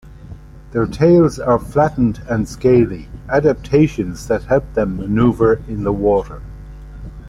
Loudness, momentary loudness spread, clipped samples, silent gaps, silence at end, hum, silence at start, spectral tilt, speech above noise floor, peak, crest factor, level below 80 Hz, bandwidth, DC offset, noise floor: -16 LUFS; 19 LU; under 0.1%; none; 0 s; none; 0.05 s; -8 dB/octave; 20 dB; -2 dBFS; 14 dB; -34 dBFS; 12.5 kHz; under 0.1%; -36 dBFS